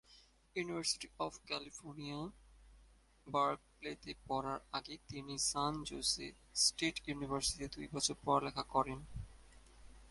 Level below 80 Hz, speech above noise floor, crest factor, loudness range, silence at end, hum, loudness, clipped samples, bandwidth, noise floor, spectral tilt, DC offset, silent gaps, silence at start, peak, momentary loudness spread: -60 dBFS; 26 dB; 22 dB; 6 LU; 0 s; none; -39 LUFS; under 0.1%; 12 kHz; -66 dBFS; -2.5 dB/octave; under 0.1%; none; 0.1 s; -18 dBFS; 14 LU